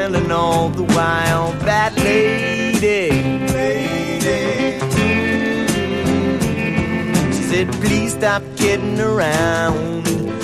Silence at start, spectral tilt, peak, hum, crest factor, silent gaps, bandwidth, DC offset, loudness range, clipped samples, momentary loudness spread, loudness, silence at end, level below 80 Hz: 0 s; -5 dB/octave; -2 dBFS; none; 14 dB; none; 15.5 kHz; under 0.1%; 2 LU; under 0.1%; 3 LU; -17 LUFS; 0 s; -38 dBFS